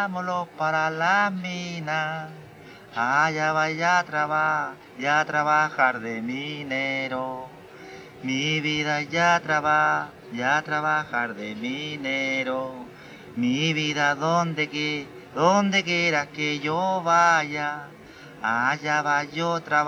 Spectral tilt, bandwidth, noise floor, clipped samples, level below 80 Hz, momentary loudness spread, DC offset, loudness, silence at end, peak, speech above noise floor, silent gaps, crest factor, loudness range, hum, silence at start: -4 dB/octave; 16 kHz; -45 dBFS; under 0.1%; -66 dBFS; 14 LU; under 0.1%; -24 LUFS; 0 s; -6 dBFS; 20 dB; none; 18 dB; 4 LU; none; 0 s